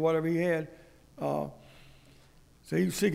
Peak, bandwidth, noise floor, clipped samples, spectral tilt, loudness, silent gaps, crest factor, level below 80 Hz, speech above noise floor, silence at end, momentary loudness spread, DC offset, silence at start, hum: -14 dBFS; 16 kHz; -58 dBFS; under 0.1%; -6 dB/octave; -31 LUFS; none; 16 dB; -60 dBFS; 29 dB; 0 s; 11 LU; under 0.1%; 0 s; none